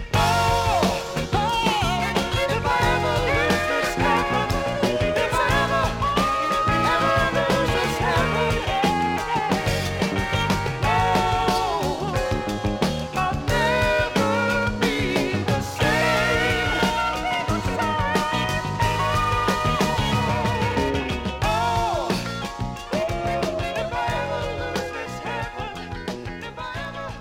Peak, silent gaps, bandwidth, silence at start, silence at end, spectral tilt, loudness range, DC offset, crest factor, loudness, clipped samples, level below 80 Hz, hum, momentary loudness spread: -8 dBFS; none; 17.5 kHz; 0 s; 0 s; -5 dB/octave; 5 LU; under 0.1%; 16 dB; -22 LUFS; under 0.1%; -36 dBFS; none; 8 LU